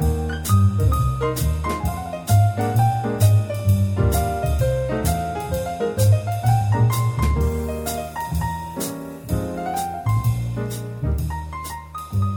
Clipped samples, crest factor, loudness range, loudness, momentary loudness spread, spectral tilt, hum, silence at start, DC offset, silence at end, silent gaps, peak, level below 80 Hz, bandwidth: under 0.1%; 16 dB; 5 LU; -22 LUFS; 9 LU; -6.5 dB/octave; none; 0 s; under 0.1%; 0 s; none; -6 dBFS; -30 dBFS; 19.5 kHz